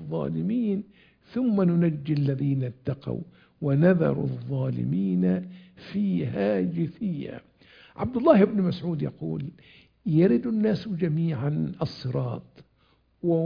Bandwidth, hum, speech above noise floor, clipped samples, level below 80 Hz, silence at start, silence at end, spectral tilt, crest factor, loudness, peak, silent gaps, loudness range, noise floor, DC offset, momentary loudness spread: 5.2 kHz; none; 39 dB; under 0.1%; -58 dBFS; 0 s; 0 s; -10.5 dB/octave; 22 dB; -26 LUFS; -4 dBFS; none; 3 LU; -65 dBFS; under 0.1%; 14 LU